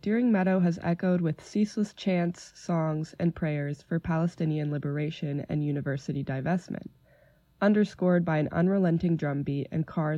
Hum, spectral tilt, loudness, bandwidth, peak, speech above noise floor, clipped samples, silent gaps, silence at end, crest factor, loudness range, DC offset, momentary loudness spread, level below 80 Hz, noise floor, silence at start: none; -8 dB/octave; -28 LUFS; 8 kHz; -12 dBFS; 34 dB; under 0.1%; none; 0 s; 16 dB; 3 LU; under 0.1%; 7 LU; -58 dBFS; -61 dBFS; 0.05 s